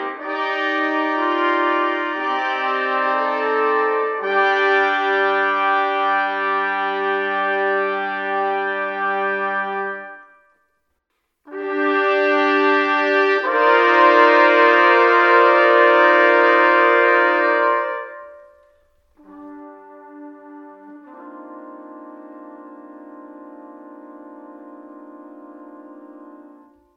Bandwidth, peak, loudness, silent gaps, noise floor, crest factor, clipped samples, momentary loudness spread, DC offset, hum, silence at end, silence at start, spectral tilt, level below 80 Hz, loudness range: 7 kHz; 0 dBFS; -16 LUFS; none; -73 dBFS; 18 dB; under 0.1%; 14 LU; under 0.1%; none; 0.55 s; 0 s; -4 dB/octave; -76 dBFS; 11 LU